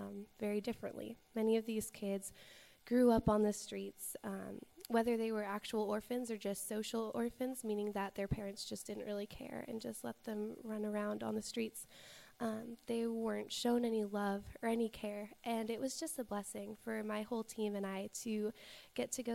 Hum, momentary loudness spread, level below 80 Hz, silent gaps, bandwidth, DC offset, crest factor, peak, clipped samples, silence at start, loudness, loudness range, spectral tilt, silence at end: none; 11 LU; -64 dBFS; none; 16 kHz; under 0.1%; 20 dB; -20 dBFS; under 0.1%; 0 s; -40 LUFS; 6 LU; -5 dB/octave; 0 s